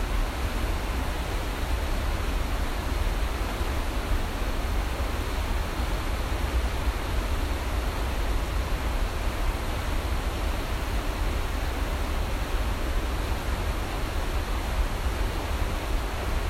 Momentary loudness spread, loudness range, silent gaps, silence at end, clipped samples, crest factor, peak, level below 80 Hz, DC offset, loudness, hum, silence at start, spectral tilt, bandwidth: 1 LU; 1 LU; none; 0 s; under 0.1%; 14 dB; -14 dBFS; -28 dBFS; under 0.1%; -30 LUFS; none; 0 s; -5 dB/octave; 16 kHz